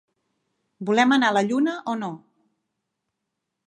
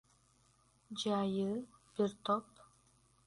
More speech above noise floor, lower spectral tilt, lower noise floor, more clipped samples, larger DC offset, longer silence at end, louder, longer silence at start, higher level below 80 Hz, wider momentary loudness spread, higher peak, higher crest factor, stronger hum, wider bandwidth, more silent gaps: first, 60 dB vs 35 dB; second, -4.5 dB/octave vs -6 dB/octave; first, -81 dBFS vs -71 dBFS; neither; neither; first, 1.5 s vs 0.85 s; first, -21 LUFS vs -38 LUFS; about the same, 0.8 s vs 0.9 s; about the same, -78 dBFS vs -74 dBFS; first, 14 LU vs 10 LU; first, -4 dBFS vs -20 dBFS; about the same, 20 dB vs 20 dB; neither; about the same, 11 kHz vs 11.5 kHz; neither